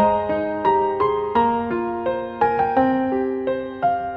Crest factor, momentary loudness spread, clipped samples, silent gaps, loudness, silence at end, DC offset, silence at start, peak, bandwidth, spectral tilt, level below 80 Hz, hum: 16 dB; 6 LU; under 0.1%; none; -21 LUFS; 0 s; under 0.1%; 0 s; -6 dBFS; 5.4 kHz; -8.5 dB/octave; -48 dBFS; none